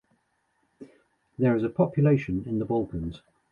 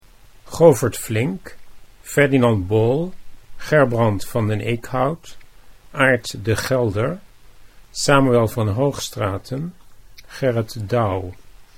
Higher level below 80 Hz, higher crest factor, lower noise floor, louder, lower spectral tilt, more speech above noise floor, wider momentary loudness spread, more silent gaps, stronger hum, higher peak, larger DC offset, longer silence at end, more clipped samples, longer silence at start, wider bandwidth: second, -50 dBFS vs -44 dBFS; about the same, 18 dB vs 20 dB; first, -72 dBFS vs -44 dBFS; second, -26 LUFS vs -19 LUFS; first, -10.5 dB/octave vs -6 dB/octave; first, 47 dB vs 26 dB; second, 12 LU vs 17 LU; neither; neither; second, -10 dBFS vs 0 dBFS; neither; first, 0.35 s vs 0.15 s; neither; first, 0.8 s vs 0.45 s; second, 6.8 kHz vs 16 kHz